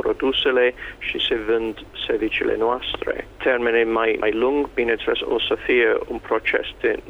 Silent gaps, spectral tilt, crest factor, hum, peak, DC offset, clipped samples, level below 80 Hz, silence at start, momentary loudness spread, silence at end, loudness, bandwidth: none; -5.5 dB/octave; 16 dB; none; -6 dBFS; under 0.1%; under 0.1%; -46 dBFS; 0 s; 7 LU; 0 s; -21 LUFS; 7 kHz